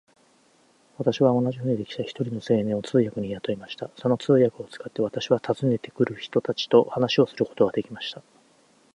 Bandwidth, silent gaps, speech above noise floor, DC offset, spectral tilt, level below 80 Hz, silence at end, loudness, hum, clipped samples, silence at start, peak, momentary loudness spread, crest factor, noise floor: 10.5 kHz; none; 37 dB; under 0.1%; -7 dB/octave; -64 dBFS; 0.75 s; -25 LUFS; none; under 0.1%; 1 s; -4 dBFS; 12 LU; 20 dB; -61 dBFS